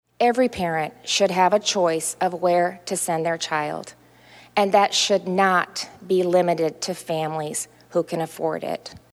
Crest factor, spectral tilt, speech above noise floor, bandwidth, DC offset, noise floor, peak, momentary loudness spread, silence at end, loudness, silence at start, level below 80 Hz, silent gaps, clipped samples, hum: 18 dB; -3.5 dB/octave; 28 dB; 15 kHz; under 0.1%; -50 dBFS; -4 dBFS; 11 LU; 0.15 s; -22 LUFS; 0.2 s; -64 dBFS; none; under 0.1%; none